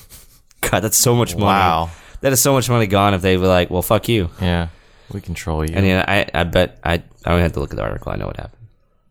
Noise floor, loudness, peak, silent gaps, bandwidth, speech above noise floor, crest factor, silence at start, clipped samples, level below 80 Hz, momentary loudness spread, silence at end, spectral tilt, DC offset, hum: -47 dBFS; -17 LUFS; -2 dBFS; none; over 20 kHz; 30 dB; 16 dB; 0.1 s; under 0.1%; -34 dBFS; 13 LU; 0.45 s; -4.5 dB/octave; under 0.1%; none